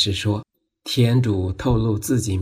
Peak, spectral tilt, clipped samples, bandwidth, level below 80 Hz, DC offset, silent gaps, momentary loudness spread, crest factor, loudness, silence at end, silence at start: -6 dBFS; -5.5 dB/octave; under 0.1%; 15.5 kHz; -38 dBFS; under 0.1%; none; 8 LU; 14 dB; -21 LUFS; 0 s; 0 s